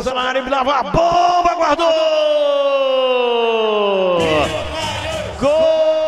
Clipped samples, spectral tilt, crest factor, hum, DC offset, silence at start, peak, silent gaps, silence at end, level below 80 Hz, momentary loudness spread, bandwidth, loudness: under 0.1%; -4.5 dB/octave; 14 dB; none; 0.2%; 0 s; 0 dBFS; none; 0 s; -40 dBFS; 7 LU; 12.5 kHz; -16 LUFS